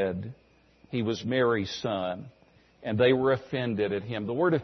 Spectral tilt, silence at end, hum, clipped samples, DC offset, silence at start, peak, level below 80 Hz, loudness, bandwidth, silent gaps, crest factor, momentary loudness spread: -6.5 dB/octave; 0 s; none; under 0.1%; under 0.1%; 0 s; -10 dBFS; -64 dBFS; -28 LUFS; 6.4 kHz; none; 18 dB; 13 LU